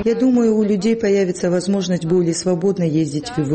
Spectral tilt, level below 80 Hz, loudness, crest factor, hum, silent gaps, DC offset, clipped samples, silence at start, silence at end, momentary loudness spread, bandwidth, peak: -6.5 dB/octave; -52 dBFS; -18 LUFS; 10 dB; none; none; under 0.1%; under 0.1%; 0 s; 0 s; 4 LU; 8.8 kHz; -8 dBFS